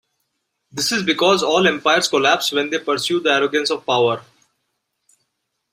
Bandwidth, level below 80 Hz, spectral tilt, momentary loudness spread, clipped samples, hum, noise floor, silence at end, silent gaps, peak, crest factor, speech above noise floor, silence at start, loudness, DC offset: 16 kHz; -64 dBFS; -3 dB/octave; 6 LU; under 0.1%; none; -74 dBFS; 1.5 s; none; -2 dBFS; 18 dB; 57 dB; 0.75 s; -17 LUFS; under 0.1%